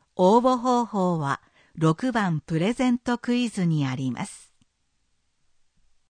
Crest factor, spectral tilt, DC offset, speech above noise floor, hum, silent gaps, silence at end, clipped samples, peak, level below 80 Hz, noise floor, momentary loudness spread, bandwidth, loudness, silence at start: 18 dB; -6.5 dB/octave; under 0.1%; 47 dB; none; none; 1.7 s; under 0.1%; -6 dBFS; -60 dBFS; -70 dBFS; 10 LU; 9.8 kHz; -24 LUFS; 0.15 s